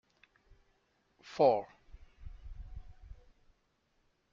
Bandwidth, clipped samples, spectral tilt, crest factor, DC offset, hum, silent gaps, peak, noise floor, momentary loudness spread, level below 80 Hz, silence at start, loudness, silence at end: 7.4 kHz; under 0.1%; -5 dB/octave; 24 dB; under 0.1%; none; none; -14 dBFS; -76 dBFS; 27 LU; -54 dBFS; 1.25 s; -30 LUFS; 1.2 s